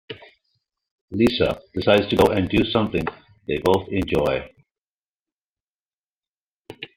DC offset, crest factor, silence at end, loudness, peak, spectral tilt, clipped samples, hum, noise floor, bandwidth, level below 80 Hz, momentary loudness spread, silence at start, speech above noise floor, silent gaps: under 0.1%; 20 dB; 0.1 s; -21 LUFS; -2 dBFS; -6.5 dB/octave; under 0.1%; none; under -90 dBFS; 16 kHz; -46 dBFS; 16 LU; 0.1 s; over 70 dB; 0.91-1.08 s, 4.78-5.26 s, 5.32-5.86 s, 5.99-6.04 s, 6.16-6.20 s, 6.27-6.62 s